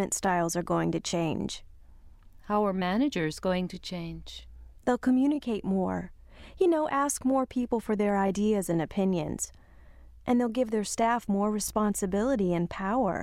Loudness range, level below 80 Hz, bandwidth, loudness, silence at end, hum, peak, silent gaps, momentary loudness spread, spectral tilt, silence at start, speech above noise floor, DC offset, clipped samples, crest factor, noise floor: 3 LU; -52 dBFS; 16 kHz; -28 LUFS; 0 s; none; -12 dBFS; none; 11 LU; -5.5 dB/octave; 0 s; 24 dB; under 0.1%; under 0.1%; 16 dB; -51 dBFS